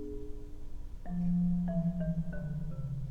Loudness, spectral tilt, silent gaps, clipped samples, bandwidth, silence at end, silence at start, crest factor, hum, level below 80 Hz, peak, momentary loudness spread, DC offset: -35 LUFS; -10.5 dB/octave; none; under 0.1%; 2.1 kHz; 0 s; 0 s; 12 dB; none; -42 dBFS; -22 dBFS; 18 LU; under 0.1%